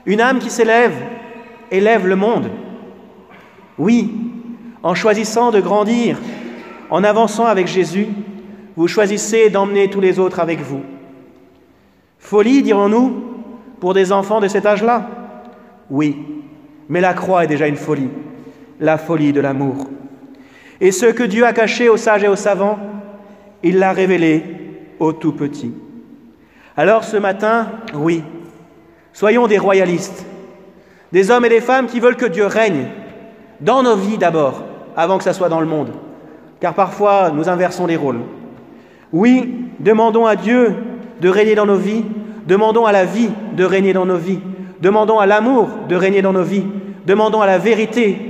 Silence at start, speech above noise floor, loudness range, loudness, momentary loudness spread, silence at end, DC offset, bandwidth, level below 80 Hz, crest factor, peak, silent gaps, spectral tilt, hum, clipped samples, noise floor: 0.05 s; 38 dB; 4 LU; -15 LUFS; 18 LU; 0 s; under 0.1%; 14 kHz; -62 dBFS; 14 dB; 0 dBFS; none; -5.5 dB/octave; none; under 0.1%; -52 dBFS